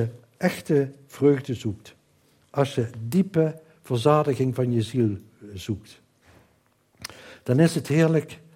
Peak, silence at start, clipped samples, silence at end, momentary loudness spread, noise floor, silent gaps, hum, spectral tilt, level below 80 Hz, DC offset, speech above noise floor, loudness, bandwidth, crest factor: -6 dBFS; 0 s; under 0.1%; 0.2 s; 17 LU; -64 dBFS; none; none; -7 dB/octave; -64 dBFS; under 0.1%; 41 dB; -24 LUFS; 16.5 kHz; 20 dB